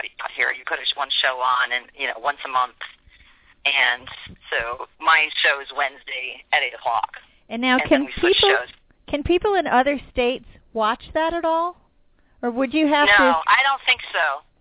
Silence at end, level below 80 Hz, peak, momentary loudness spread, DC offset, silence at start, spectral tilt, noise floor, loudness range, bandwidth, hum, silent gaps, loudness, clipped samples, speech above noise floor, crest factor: 0.2 s; -48 dBFS; -4 dBFS; 13 LU; under 0.1%; 0 s; -6.5 dB/octave; -58 dBFS; 4 LU; 4 kHz; none; none; -20 LUFS; under 0.1%; 37 dB; 18 dB